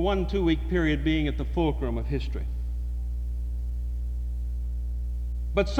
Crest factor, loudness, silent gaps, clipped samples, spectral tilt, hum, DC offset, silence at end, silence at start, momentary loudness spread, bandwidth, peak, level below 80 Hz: 16 dB; -29 LUFS; none; under 0.1%; -7.5 dB/octave; 60 Hz at -30 dBFS; under 0.1%; 0 s; 0 s; 8 LU; 6.6 kHz; -10 dBFS; -30 dBFS